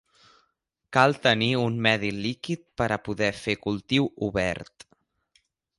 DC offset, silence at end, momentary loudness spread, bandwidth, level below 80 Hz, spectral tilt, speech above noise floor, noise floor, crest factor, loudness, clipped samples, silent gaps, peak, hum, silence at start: under 0.1%; 1.15 s; 9 LU; 11.5 kHz; -54 dBFS; -5.5 dB/octave; 50 dB; -75 dBFS; 22 dB; -25 LUFS; under 0.1%; none; -4 dBFS; none; 0.9 s